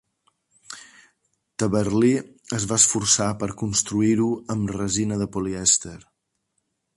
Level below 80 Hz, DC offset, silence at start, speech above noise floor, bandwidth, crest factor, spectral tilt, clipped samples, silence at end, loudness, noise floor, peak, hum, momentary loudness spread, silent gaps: -50 dBFS; under 0.1%; 0.7 s; 53 dB; 11.5 kHz; 20 dB; -3.5 dB/octave; under 0.1%; 1 s; -21 LUFS; -75 dBFS; -4 dBFS; none; 20 LU; none